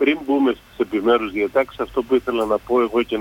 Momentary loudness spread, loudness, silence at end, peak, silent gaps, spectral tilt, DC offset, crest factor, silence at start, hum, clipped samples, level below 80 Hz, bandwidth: 5 LU; -20 LUFS; 0 s; -4 dBFS; none; -5.5 dB/octave; under 0.1%; 14 dB; 0 s; none; under 0.1%; -50 dBFS; 17 kHz